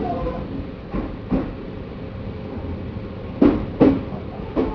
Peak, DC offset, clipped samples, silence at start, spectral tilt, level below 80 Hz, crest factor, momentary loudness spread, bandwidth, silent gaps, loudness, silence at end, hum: -2 dBFS; under 0.1%; under 0.1%; 0 s; -10 dB/octave; -36 dBFS; 22 dB; 15 LU; 5.4 kHz; none; -24 LUFS; 0 s; none